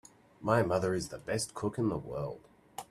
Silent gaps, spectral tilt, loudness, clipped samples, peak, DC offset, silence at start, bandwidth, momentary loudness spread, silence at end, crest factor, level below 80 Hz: none; -5.5 dB/octave; -33 LUFS; under 0.1%; -12 dBFS; under 0.1%; 0.4 s; 14 kHz; 17 LU; 0.05 s; 22 dB; -60 dBFS